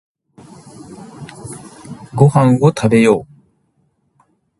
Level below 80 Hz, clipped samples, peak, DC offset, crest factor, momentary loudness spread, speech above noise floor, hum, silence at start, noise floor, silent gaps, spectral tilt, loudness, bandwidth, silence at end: -52 dBFS; under 0.1%; 0 dBFS; under 0.1%; 18 dB; 24 LU; 51 dB; none; 0.9 s; -62 dBFS; none; -7.5 dB/octave; -13 LUFS; 11.5 kHz; 1.35 s